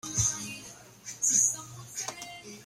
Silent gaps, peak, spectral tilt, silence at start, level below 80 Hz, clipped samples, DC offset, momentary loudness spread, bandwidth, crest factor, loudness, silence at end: none; -12 dBFS; -1.5 dB/octave; 0.05 s; -58 dBFS; under 0.1%; under 0.1%; 20 LU; 16 kHz; 22 dB; -27 LUFS; 0 s